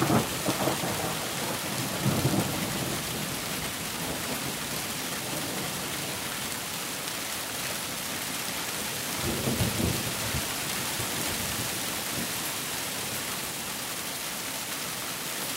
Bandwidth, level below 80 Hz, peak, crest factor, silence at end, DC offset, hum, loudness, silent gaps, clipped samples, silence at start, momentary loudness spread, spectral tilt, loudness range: 16.5 kHz; -52 dBFS; -12 dBFS; 20 dB; 0 s; under 0.1%; none; -30 LUFS; none; under 0.1%; 0 s; 4 LU; -3 dB/octave; 2 LU